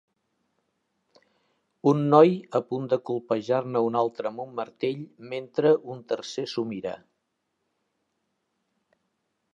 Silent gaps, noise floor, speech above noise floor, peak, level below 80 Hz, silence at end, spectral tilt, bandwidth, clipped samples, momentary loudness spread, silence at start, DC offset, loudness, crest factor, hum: none; -78 dBFS; 53 dB; -4 dBFS; -76 dBFS; 2.6 s; -7 dB/octave; 7.8 kHz; under 0.1%; 16 LU; 1.85 s; under 0.1%; -25 LUFS; 22 dB; none